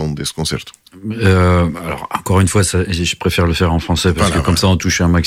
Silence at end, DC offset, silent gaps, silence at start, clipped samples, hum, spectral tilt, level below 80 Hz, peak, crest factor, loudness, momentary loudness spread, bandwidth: 0 s; under 0.1%; none; 0 s; under 0.1%; none; -5 dB/octave; -28 dBFS; -2 dBFS; 14 dB; -15 LUFS; 10 LU; 15.5 kHz